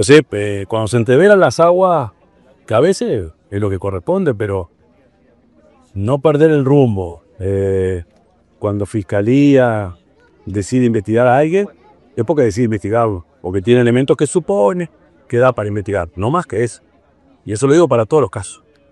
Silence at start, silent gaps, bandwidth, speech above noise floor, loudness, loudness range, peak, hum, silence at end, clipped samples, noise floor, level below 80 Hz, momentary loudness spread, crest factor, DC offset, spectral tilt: 0 s; none; 11.5 kHz; 39 dB; -15 LUFS; 5 LU; 0 dBFS; none; 0.35 s; under 0.1%; -52 dBFS; -46 dBFS; 14 LU; 14 dB; under 0.1%; -6.5 dB/octave